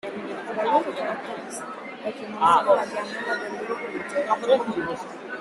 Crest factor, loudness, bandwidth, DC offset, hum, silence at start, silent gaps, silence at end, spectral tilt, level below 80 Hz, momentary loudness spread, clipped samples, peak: 20 dB; -25 LUFS; 12.5 kHz; under 0.1%; none; 0.05 s; none; 0 s; -4 dB/octave; -66 dBFS; 14 LU; under 0.1%; -6 dBFS